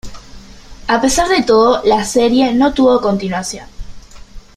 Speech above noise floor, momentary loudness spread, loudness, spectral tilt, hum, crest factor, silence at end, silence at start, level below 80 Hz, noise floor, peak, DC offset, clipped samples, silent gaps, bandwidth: 23 dB; 11 LU; -13 LUFS; -4 dB/octave; none; 14 dB; 0.15 s; 0.05 s; -34 dBFS; -35 dBFS; 0 dBFS; under 0.1%; under 0.1%; none; 14.5 kHz